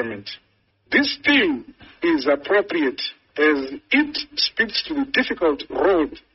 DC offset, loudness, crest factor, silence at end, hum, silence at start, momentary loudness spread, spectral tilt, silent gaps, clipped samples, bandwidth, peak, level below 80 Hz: under 0.1%; -20 LUFS; 20 dB; 0.15 s; none; 0 s; 11 LU; -0.5 dB/octave; none; under 0.1%; 6 kHz; -2 dBFS; -54 dBFS